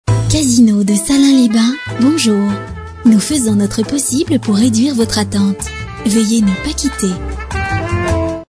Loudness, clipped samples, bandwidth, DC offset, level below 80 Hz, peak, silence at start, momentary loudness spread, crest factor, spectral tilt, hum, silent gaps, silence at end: -13 LUFS; under 0.1%; 11 kHz; under 0.1%; -30 dBFS; 0 dBFS; 0.05 s; 9 LU; 12 dB; -5 dB/octave; none; none; 0.05 s